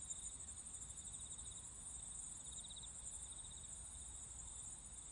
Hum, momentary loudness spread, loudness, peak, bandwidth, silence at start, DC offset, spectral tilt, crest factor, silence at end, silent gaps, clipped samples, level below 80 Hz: none; 2 LU; -50 LUFS; -34 dBFS; 11.5 kHz; 0 s; under 0.1%; -1 dB/octave; 18 dB; 0 s; none; under 0.1%; -64 dBFS